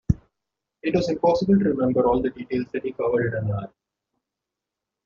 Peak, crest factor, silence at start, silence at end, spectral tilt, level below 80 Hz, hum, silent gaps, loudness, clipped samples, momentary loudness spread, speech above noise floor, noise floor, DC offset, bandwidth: -4 dBFS; 20 dB; 0.1 s; 1.4 s; -7 dB/octave; -44 dBFS; none; none; -23 LUFS; under 0.1%; 10 LU; 63 dB; -86 dBFS; under 0.1%; 7.2 kHz